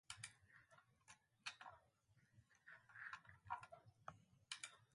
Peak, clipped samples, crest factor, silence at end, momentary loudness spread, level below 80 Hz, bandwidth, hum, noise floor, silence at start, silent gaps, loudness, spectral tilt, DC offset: -34 dBFS; under 0.1%; 26 dB; 0 s; 15 LU; -86 dBFS; 11.5 kHz; none; -79 dBFS; 0.1 s; none; -57 LUFS; -1 dB/octave; under 0.1%